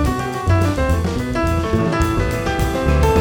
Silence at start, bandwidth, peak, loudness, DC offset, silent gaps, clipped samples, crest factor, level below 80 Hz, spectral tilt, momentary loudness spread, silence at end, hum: 0 s; 18 kHz; -2 dBFS; -18 LUFS; under 0.1%; none; under 0.1%; 14 dB; -24 dBFS; -6.5 dB/octave; 3 LU; 0 s; none